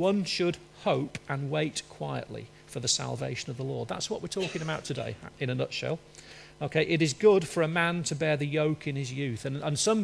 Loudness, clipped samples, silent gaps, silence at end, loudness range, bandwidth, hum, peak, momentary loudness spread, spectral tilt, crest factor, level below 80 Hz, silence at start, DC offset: -30 LUFS; under 0.1%; none; 0 s; 6 LU; 11 kHz; none; -10 dBFS; 11 LU; -4.5 dB/octave; 18 dB; -62 dBFS; 0 s; under 0.1%